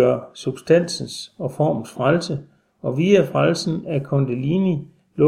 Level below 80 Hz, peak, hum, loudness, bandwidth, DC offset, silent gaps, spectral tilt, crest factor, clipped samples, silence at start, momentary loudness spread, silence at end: -60 dBFS; -2 dBFS; none; -21 LUFS; 13 kHz; under 0.1%; none; -6.5 dB/octave; 18 dB; under 0.1%; 0 s; 13 LU; 0 s